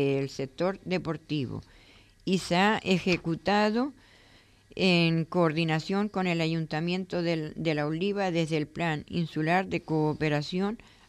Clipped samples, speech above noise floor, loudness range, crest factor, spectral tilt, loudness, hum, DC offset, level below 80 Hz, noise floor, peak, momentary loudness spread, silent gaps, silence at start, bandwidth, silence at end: under 0.1%; 30 dB; 2 LU; 18 dB; -6 dB/octave; -28 LUFS; none; under 0.1%; -58 dBFS; -58 dBFS; -10 dBFS; 8 LU; none; 0 s; 12 kHz; 0.35 s